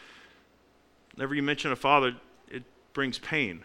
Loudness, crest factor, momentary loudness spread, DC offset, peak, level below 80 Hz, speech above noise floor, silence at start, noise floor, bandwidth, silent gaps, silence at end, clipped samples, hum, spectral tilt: -28 LUFS; 24 dB; 20 LU; under 0.1%; -8 dBFS; -64 dBFS; 35 dB; 0 s; -63 dBFS; 15.5 kHz; none; 0 s; under 0.1%; none; -5 dB/octave